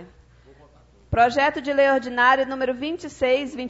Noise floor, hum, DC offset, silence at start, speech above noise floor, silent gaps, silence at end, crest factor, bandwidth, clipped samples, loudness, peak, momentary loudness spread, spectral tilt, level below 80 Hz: -53 dBFS; none; under 0.1%; 0 s; 32 dB; none; 0 s; 16 dB; 8 kHz; under 0.1%; -21 LUFS; -6 dBFS; 8 LU; -5 dB/octave; -48 dBFS